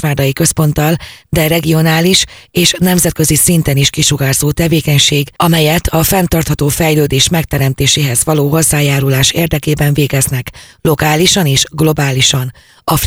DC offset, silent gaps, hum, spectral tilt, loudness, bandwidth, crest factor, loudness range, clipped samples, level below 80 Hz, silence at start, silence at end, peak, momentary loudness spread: 0.2%; none; none; -4 dB/octave; -11 LUFS; over 20 kHz; 12 dB; 1 LU; under 0.1%; -30 dBFS; 0 s; 0 s; 0 dBFS; 6 LU